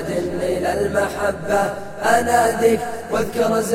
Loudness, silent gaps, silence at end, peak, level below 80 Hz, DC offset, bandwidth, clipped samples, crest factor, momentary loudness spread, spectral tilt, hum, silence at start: -19 LUFS; none; 0 s; -4 dBFS; -44 dBFS; under 0.1%; 16.5 kHz; under 0.1%; 16 dB; 7 LU; -4.5 dB/octave; none; 0 s